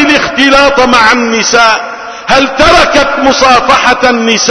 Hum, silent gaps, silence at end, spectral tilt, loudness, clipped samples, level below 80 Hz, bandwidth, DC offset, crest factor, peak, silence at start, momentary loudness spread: none; none; 0 s; -2.5 dB/octave; -6 LUFS; 3%; -30 dBFS; 11 kHz; under 0.1%; 6 dB; 0 dBFS; 0 s; 4 LU